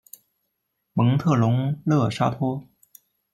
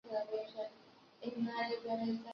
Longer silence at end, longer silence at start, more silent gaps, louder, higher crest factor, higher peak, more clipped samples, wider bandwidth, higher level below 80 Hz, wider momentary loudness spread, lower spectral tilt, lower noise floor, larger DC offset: first, 0.7 s vs 0 s; first, 0.95 s vs 0.05 s; neither; first, -22 LUFS vs -41 LUFS; about the same, 16 dB vs 14 dB; first, -8 dBFS vs -26 dBFS; neither; first, 16 kHz vs 6.4 kHz; first, -60 dBFS vs -84 dBFS; about the same, 8 LU vs 9 LU; first, -8 dB/octave vs -3.5 dB/octave; first, -77 dBFS vs -63 dBFS; neither